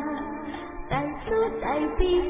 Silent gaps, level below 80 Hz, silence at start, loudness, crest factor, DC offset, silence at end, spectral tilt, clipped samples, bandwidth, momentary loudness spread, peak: none; -38 dBFS; 0 s; -28 LUFS; 18 dB; under 0.1%; 0 s; -10 dB/octave; under 0.1%; 3.8 kHz; 10 LU; -8 dBFS